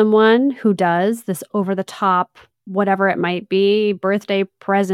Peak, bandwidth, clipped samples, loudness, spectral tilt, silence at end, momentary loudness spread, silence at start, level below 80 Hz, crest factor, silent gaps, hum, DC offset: -4 dBFS; 15.5 kHz; under 0.1%; -18 LUFS; -6 dB/octave; 0 s; 8 LU; 0 s; -68 dBFS; 14 dB; none; none; under 0.1%